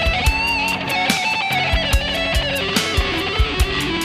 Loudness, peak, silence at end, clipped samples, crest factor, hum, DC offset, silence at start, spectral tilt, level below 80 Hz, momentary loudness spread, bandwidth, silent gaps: -18 LUFS; -2 dBFS; 0 s; under 0.1%; 18 dB; none; under 0.1%; 0 s; -3.5 dB/octave; -24 dBFS; 2 LU; 15.5 kHz; none